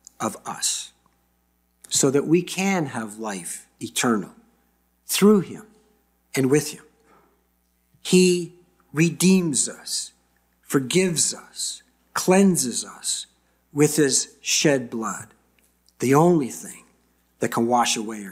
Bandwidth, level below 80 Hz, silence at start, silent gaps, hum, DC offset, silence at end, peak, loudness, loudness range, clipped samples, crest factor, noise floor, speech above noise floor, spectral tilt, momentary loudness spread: 16 kHz; -66 dBFS; 0.2 s; none; 60 Hz at -50 dBFS; under 0.1%; 0 s; -6 dBFS; -22 LUFS; 3 LU; under 0.1%; 18 dB; -67 dBFS; 46 dB; -4 dB/octave; 16 LU